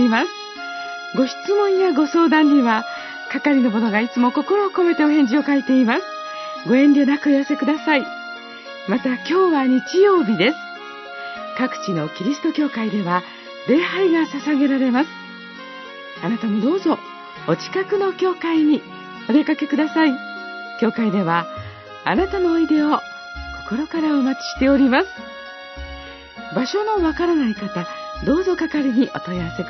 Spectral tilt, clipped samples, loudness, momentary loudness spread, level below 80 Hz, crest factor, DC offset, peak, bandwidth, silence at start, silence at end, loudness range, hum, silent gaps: -6 dB/octave; under 0.1%; -19 LUFS; 17 LU; -48 dBFS; 16 dB; under 0.1%; -4 dBFS; 6.2 kHz; 0 s; 0 s; 5 LU; none; none